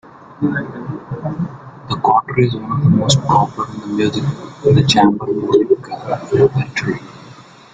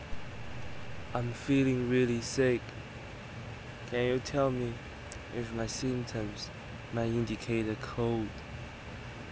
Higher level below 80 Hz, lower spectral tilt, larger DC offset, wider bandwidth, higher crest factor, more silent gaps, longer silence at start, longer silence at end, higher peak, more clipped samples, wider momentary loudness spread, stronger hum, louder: about the same, -46 dBFS vs -50 dBFS; about the same, -6 dB/octave vs -6 dB/octave; neither; first, 9.4 kHz vs 8 kHz; about the same, 16 dB vs 18 dB; neither; about the same, 0.05 s vs 0 s; first, 0.35 s vs 0 s; first, 0 dBFS vs -16 dBFS; neither; about the same, 13 LU vs 15 LU; neither; first, -16 LUFS vs -34 LUFS